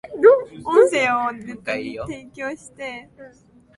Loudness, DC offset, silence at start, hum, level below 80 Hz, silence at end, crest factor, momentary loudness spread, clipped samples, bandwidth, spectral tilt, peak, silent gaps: -19 LUFS; under 0.1%; 0.05 s; none; -56 dBFS; 0.5 s; 18 dB; 18 LU; under 0.1%; 11.5 kHz; -4.5 dB/octave; -2 dBFS; none